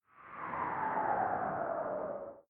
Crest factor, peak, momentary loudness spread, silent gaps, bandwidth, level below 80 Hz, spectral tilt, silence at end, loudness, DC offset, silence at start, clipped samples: 16 dB; -22 dBFS; 9 LU; none; 3.9 kHz; -70 dBFS; -9.5 dB/octave; 0.1 s; -36 LUFS; under 0.1%; 0.15 s; under 0.1%